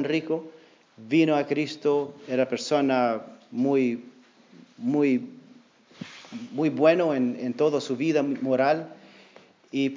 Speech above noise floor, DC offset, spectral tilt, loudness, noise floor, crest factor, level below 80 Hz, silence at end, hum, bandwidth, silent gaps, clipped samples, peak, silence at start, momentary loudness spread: 30 dB; under 0.1%; -6 dB/octave; -25 LUFS; -54 dBFS; 18 dB; -86 dBFS; 0 s; none; 7.6 kHz; none; under 0.1%; -6 dBFS; 0 s; 15 LU